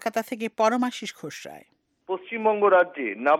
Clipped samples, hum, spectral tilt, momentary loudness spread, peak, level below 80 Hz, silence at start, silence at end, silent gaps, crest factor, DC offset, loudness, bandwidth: under 0.1%; none; -4 dB/octave; 18 LU; -8 dBFS; -80 dBFS; 0 s; 0 s; none; 18 dB; under 0.1%; -24 LUFS; 16.5 kHz